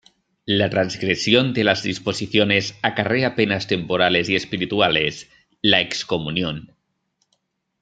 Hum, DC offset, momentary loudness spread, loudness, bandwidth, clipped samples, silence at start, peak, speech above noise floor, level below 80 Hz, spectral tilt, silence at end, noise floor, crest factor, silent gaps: none; under 0.1%; 7 LU; -20 LUFS; 9.2 kHz; under 0.1%; 0.45 s; -2 dBFS; 51 dB; -56 dBFS; -4.5 dB/octave; 1.15 s; -71 dBFS; 20 dB; none